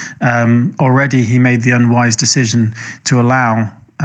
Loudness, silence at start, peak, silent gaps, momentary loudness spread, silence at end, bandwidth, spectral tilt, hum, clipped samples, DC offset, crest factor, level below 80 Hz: -11 LUFS; 0 s; 0 dBFS; none; 6 LU; 0 s; 9 kHz; -5 dB/octave; none; under 0.1%; under 0.1%; 12 dB; -56 dBFS